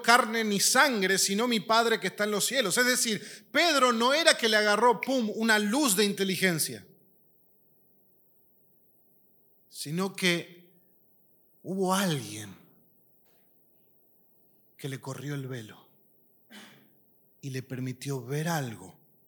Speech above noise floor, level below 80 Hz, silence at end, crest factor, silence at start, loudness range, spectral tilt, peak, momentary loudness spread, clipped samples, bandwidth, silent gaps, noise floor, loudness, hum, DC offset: 37 dB; -88 dBFS; 0.35 s; 28 dB; 0 s; 18 LU; -3 dB/octave; -2 dBFS; 18 LU; under 0.1%; 19 kHz; none; -64 dBFS; -26 LUFS; none; under 0.1%